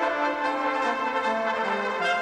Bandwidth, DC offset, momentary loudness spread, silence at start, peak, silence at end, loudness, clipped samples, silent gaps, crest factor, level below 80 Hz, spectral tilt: 11 kHz; under 0.1%; 1 LU; 0 s; -12 dBFS; 0 s; -26 LUFS; under 0.1%; none; 12 dB; -68 dBFS; -3.5 dB/octave